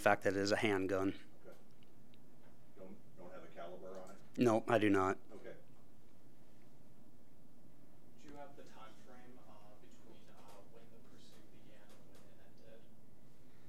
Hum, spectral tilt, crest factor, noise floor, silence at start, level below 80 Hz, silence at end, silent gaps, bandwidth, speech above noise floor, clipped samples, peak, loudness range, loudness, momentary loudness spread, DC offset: none; -5.5 dB/octave; 28 dB; -66 dBFS; 0 s; -76 dBFS; 0.95 s; none; 16 kHz; 32 dB; under 0.1%; -16 dBFS; 24 LU; -36 LUFS; 29 LU; 0.6%